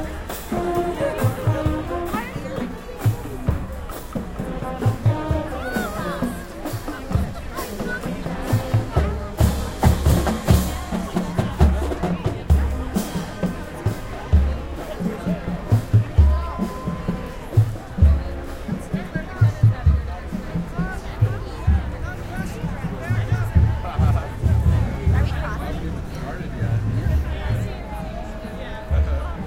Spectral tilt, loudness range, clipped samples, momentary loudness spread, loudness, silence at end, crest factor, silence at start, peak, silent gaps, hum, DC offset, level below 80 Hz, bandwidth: -7 dB/octave; 5 LU; under 0.1%; 11 LU; -23 LUFS; 0 s; 20 dB; 0 s; -2 dBFS; none; none; 0.1%; -26 dBFS; 16.5 kHz